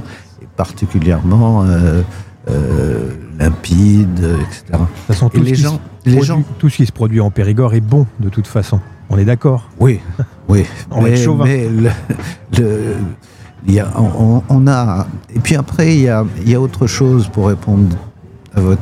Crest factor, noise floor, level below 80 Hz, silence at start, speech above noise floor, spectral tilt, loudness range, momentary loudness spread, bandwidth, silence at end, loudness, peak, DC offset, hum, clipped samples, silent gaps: 12 dB; -34 dBFS; -32 dBFS; 0 s; 23 dB; -7.5 dB/octave; 2 LU; 9 LU; 14 kHz; 0 s; -13 LUFS; 0 dBFS; under 0.1%; none; under 0.1%; none